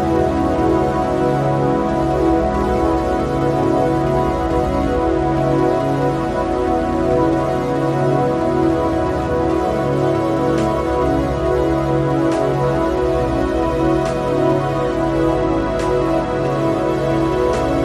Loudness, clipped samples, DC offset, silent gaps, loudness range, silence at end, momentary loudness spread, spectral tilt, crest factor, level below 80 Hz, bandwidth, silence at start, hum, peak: -17 LUFS; under 0.1%; under 0.1%; none; 1 LU; 0 s; 2 LU; -7.5 dB/octave; 14 dB; -30 dBFS; 13 kHz; 0 s; none; -4 dBFS